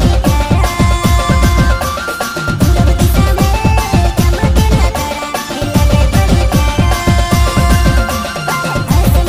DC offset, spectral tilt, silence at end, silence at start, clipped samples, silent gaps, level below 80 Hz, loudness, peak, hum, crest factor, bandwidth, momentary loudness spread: under 0.1%; -5.5 dB/octave; 0 s; 0 s; under 0.1%; none; -14 dBFS; -12 LUFS; 0 dBFS; none; 10 dB; 16 kHz; 6 LU